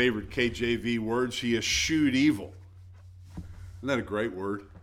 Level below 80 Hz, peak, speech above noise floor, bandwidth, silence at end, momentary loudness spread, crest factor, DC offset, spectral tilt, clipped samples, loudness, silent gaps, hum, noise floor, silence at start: -50 dBFS; -12 dBFS; 21 dB; 16 kHz; 0.05 s; 21 LU; 18 dB; under 0.1%; -4 dB/octave; under 0.1%; -28 LUFS; none; none; -49 dBFS; 0 s